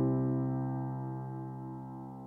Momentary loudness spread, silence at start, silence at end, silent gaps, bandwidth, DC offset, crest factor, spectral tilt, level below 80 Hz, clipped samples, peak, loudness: 12 LU; 0 s; 0 s; none; 2.1 kHz; under 0.1%; 14 dB; -12.5 dB/octave; -62 dBFS; under 0.1%; -22 dBFS; -36 LUFS